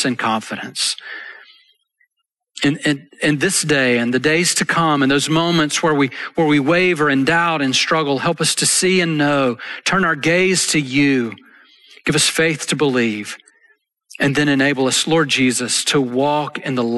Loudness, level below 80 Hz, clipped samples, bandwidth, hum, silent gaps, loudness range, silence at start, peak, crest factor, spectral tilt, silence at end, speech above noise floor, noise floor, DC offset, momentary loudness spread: -16 LUFS; -56 dBFS; under 0.1%; 12.5 kHz; none; none; 4 LU; 0 s; -4 dBFS; 14 dB; -3.5 dB/octave; 0 s; 59 dB; -75 dBFS; under 0.1%; 7 LU